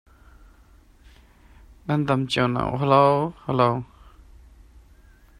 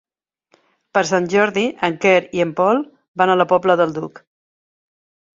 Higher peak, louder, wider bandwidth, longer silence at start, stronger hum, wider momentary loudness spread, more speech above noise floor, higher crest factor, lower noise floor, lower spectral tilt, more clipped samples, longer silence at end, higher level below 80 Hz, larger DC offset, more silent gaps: about the same, -4 dBFS vs -2 dBFS; second, -22 LUFS vs -17 LUFS; first, 10.5 kHz vs 7.8 kHz; first, 1.85 s vs 0.95 s; neither; first, 13 LU vs 7 LU; second, 32 dB vs 53 dB; about the same, 22 dB vs 18 dB; second, -53 dBFS vs -69 dBFS; first, -7 dB/octave vs -5 dB/octave; neither; first, 1.55 s vs 1.3 s; first, -50 dBFS vs -62 dBFS; neither; second, none vs 3.08-3.14 s